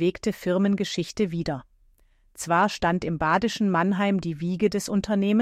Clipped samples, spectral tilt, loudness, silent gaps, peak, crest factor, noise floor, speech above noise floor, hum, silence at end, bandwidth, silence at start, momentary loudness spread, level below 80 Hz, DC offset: under 0.1%; -5.5 dB/octave; -25 LUFS; none; -8 dBFS; 16 dB; -60 dBFS; 36 dB; none; 0 s; 14.5 kHz; 0 s; 6 LU; -52 dBFS; under 0.1%